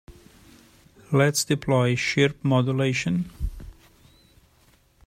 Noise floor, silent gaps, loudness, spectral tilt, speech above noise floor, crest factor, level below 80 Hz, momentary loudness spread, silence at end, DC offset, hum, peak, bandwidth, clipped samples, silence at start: -60 dBFS; none; -23 LUFS; -5 dB/octave; 38 dB; 20 dB; -44 dBFS; 9 LU; 1.35 s; under 0.1%; none; -6 dBFS; 16 kHz; under 0.1%; 0.1 s